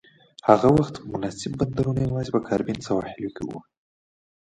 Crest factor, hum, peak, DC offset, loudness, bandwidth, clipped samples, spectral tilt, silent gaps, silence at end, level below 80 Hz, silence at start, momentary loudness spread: 24 dB; none; 0 dBFS; under 0.1%; -24 LUFS; 10.5 kHz; under 0.1%; -7.5 dB/octave; none; 0.9 s; -50 dBFS; 0.45 s; 15 LU